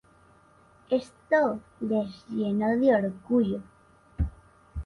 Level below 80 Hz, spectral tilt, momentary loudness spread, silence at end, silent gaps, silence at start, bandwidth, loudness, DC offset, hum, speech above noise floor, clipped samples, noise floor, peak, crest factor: -44 dBFS; -8.5 dB/octave; 11 LU; 0 s; none; 0.9 s; 11 kHz; -27 LUFS; under 0.1%; none; 32 dB; under 0.1%; -58 dBFS; -10 dBFS; 18 dB